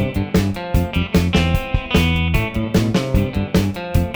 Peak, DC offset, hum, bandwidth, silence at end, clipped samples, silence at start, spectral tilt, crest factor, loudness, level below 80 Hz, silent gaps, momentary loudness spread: -2 dBFS; under 0.1%; none; over 20 kHz; 0 s; under 0.1%; 0 s; -6.5 dB/octave; 16 dB; -19 LUFS; -26 dBFS; none; 4 LU